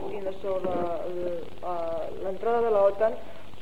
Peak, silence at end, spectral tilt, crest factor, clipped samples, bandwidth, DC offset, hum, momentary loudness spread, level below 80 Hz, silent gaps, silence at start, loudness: -10 dBFS; 0 s; -7 dB/octave; 16 dB; under 0.1%; 13 kHz; 2%; none; 12 LU; -56 dBFS; none; 0 s; -29 LUFS